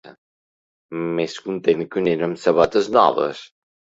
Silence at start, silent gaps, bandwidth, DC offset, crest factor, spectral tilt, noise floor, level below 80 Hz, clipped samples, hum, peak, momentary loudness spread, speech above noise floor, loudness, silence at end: 0.05 s; 0.18-0.89 s; 8 kHz; under 0.1%; 22 dB; -6 dB/octave; under -90 dBFS; -58 dBFS; under 0.1%; none; 0 dBFS; 11 LU; over 71 dB; -20 LUFS; 0.5 s